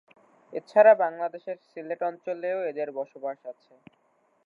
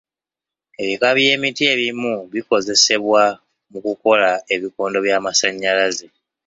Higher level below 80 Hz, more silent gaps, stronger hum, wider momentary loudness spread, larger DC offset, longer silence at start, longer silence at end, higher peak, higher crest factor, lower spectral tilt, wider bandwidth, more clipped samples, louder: second, under -90 dBFS vs -64 dBFS; neither; neither; first, 20 LU vs 12 LU; neither; second, 0.5 s vs 0.8 s; first, 0.95 s vs 0.45 s; second, -6 dBFS vs 0 dBFS; about the same, 22 dB vs 18 dB; first, -6.5 dB/octave vs -1.5 dB/octave; second, 5 kHz vs 7.8 kHz; neither; second, -25 LUFS vs -17 LUFS